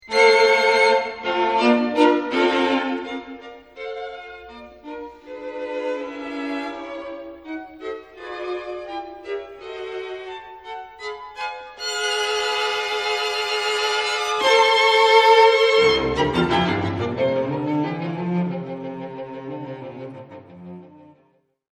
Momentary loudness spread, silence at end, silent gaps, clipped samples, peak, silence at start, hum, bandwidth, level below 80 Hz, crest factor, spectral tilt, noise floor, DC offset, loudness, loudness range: 21 LU; 0.85 s; none; under 0.1%; -2 dBFS; 0.05 s; none; 13 kHz; -52 dBFS; 20 dB; -4 dB/octave; -62 dBFS; under 0.1%; -19 LUFS; 16 LU